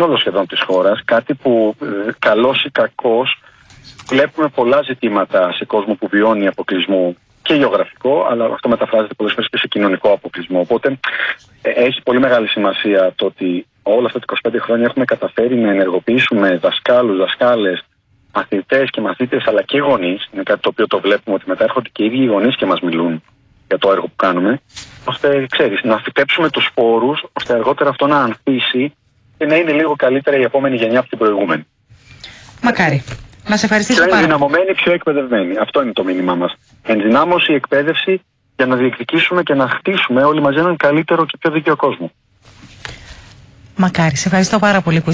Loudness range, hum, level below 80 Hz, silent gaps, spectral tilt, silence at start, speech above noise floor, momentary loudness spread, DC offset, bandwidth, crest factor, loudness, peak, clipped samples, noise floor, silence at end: 3 LU; none; -52 dBFS; none; -5 dB/octave; 0 s; 29 dB; 7 LU; under 0.1%; 8 kHz; 14 dB; -15 LUFS; -2 dBFS; under 0.1%; -44 dBFS; 0 s